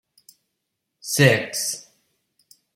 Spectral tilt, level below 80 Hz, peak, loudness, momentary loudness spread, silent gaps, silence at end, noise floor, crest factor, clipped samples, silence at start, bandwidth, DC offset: -4 dB/octave; -60 dBFS; -2 dBFS; -20 LUFS; 17 LU; none; 0.95 s; -79 dBFS; 24 dB; under 0.1%; 1.05 s; 16.5 kHz; under 0.1%